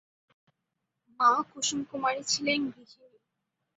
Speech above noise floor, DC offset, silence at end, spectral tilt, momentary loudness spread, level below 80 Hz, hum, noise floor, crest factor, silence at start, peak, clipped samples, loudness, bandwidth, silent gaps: 54 dB; under 0.1%; 0.95 s; -1.5 dB/octave; 6 LU; -74 dBFS; none; -84 dBFS; 22 dB; 1.2 s; -10 dBFS; under 0.1%; -28 LUFS; 8.2 kHz; none